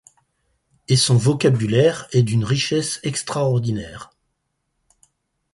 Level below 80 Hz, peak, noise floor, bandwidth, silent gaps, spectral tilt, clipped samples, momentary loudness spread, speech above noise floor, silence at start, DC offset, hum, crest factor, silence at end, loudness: -52 dBFS; -4 dBFS; -74 dBFS; 11.5 kHz; none; -5 dB/octave; under 0.1%; 9 LU; 55 dB; 0.9 s; under 0.1%; none; 18 dB; 1.5 s; -19 LUFS